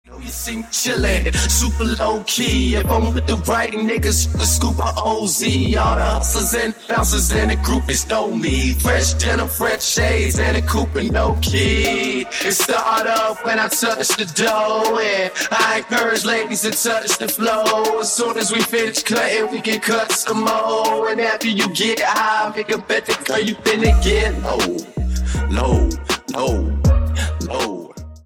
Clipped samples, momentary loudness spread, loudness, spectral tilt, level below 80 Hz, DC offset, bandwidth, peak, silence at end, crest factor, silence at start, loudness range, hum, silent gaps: under 0.1%; 4 LU; -18 LUFS; -3.5 dB/octave; -24 dBFS; under 0.1%; over 20 kHz; -2 dBFS; 0.05 s; 16 dB; 0.1 s; 1 LU; none; none